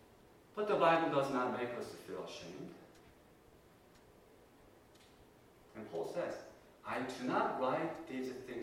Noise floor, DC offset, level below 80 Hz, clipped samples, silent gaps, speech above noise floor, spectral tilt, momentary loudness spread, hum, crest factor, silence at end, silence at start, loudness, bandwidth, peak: -63 dBFS; under 0.1%; -74 dBFS; under 0.1%; none; 26 dB; -5.5 dB/octave; 20 LU; none; 22 dB; 0 s; 0.55 s; -38 LUFS; 16.5 kHz; -16 dBFS